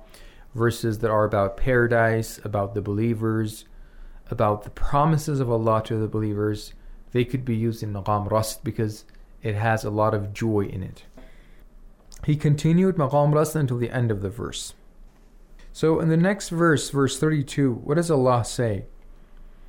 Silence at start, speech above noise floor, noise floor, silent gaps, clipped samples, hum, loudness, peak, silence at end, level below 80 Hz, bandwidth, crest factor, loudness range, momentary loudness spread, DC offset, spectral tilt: 0 s; 26 dB; -48 dBFS; none; under 0.1%; none; -24 LUFS; -8 dBFS; 0 s; -42 dBFS; 17.5 kHz; 14 dB; 4 LU; 11 LU; under 0.1%; -6.5 dB/octave